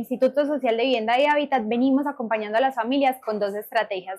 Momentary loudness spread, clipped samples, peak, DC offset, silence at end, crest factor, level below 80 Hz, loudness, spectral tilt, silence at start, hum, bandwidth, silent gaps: 6 LU; under 0.1%; -10 dBFS; under 0.1%; 0 s; 12 dB; -74 dBFS; -23 LUFS; -5 dB/octave; 0 s; none; 15.5 kHz; none